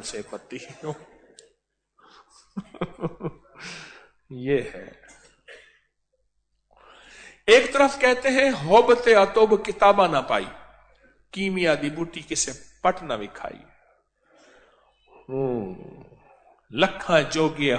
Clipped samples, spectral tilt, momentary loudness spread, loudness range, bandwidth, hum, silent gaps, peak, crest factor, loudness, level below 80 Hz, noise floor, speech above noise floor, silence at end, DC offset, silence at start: under 0.1%; -4 dB/octave; 22 LU; 18 LU; 9.4 kHz; none; none; -4 dBFS; 20 dB; -21 LUFS; -56 dBFS; -72 dBFS; 50 dB; 0 s; under 0.1%; 0 s